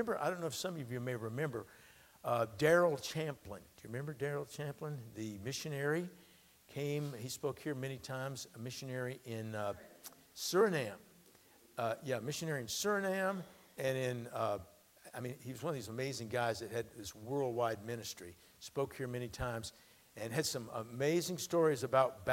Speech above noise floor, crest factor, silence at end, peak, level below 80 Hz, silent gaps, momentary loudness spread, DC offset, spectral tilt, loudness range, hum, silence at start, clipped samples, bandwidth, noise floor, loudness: 27 dB; 22 dB; 0 s; -18 dBFS; -68 dBFS; none; 15 LU; under 0.1%; -4.5 dB/octave; 5 LU; none; 0 s; under 0.1%; 16.5 kHz; -65 dBFS; -38 LUFS